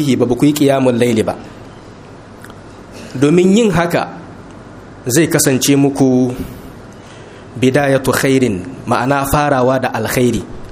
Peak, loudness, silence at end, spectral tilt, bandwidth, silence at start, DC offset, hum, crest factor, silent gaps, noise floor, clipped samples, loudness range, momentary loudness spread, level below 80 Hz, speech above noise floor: 0 dBFS; -13 LUFS; 0 s; -5 dB/octave; 15.5 kHz; 0 s; under 0.1%; none; 14 dB; none; -35 dBFS; under 0.1%; 3 LU; 23 LU; -38 dBFS; 23 dB